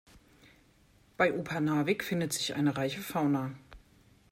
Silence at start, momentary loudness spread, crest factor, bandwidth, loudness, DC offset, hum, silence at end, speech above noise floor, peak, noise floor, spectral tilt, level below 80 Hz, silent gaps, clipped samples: 0.15 s; 5 LU; 20 dB; 16 kHz; -31 LUFS; under 0.1%; none; 0.55 s; 33 dB; -14 dBFS; -64 dBFS; -5 dB/octave; -64 dBFS; none; under 0.1%